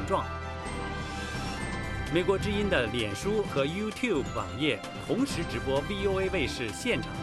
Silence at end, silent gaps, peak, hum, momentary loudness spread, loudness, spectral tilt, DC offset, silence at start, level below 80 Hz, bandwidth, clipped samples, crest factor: 0 s; none; -12 dBFS; none; 8 LU; -30 LUFS; -5 dB/octave; under 0.1%; 0 s; -44 dBFS; 14 kHz; under 0.1%; 18 dB